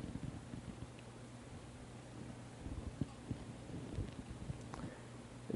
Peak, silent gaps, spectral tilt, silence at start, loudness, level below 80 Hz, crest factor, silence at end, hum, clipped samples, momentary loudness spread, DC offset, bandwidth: -26 dBFS; none; -6.5 dB/octave; 0 s; -50 LUFS; -56 dBFS; 22 dB; 0 s; none; under 0.1%; 7 LU; under 0.1%; 11.5 kHz